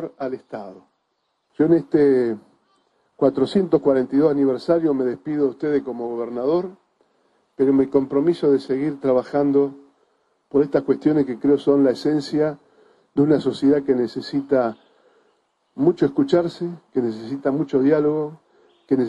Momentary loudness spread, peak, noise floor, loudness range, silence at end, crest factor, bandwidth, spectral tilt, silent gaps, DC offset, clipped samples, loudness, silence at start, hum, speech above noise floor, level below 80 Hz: 10 LU; -4 dBFS; -72 dBFS; 3 LU; 0 s; 18 dB; 9.4 kHz; -8 dB/octave; none; under 0.1%; under 0.1%; -20 LUFS; 0 s; none; 52 dB; -60 dBFS